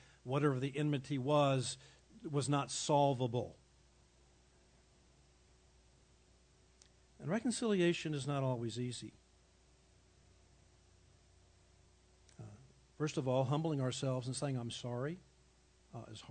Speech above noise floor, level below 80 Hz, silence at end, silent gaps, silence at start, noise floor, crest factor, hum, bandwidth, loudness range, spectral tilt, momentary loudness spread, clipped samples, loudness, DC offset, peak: 32 dB; -72 dBFS; 0 s; none; 0.25 s; -68 dBFS; 20 dB; none; 9 kHz; 12 LU; -5.5 dB/octave; 19 LU; under 0.1%; -37 LUFS; under 0.1%; -20 dBFS